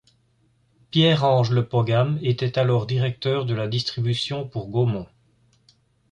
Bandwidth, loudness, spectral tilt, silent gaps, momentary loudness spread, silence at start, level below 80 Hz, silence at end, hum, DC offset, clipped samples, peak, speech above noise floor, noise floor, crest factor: 9.4 kHz; -22 LUFS; -7 dB/octave; none; 7 LU; 0.95 s; -56 dBFS; 1.05 s; none; under 0.1%; under 0.1%; -6 dBFS; 42 dB; -63 dBFS; 16 dB